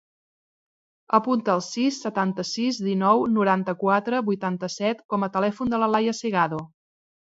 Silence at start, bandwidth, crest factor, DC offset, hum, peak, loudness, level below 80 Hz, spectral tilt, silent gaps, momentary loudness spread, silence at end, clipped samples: 1.1 s; 7.8 kHz; 20 dB; under 0.1%; none; -4 dBFS; -24 LUFS; -64 dBFS; -5.5 dB/octave; 5.05-5.09 s; 6 LU; 0.75 s; under 0.1%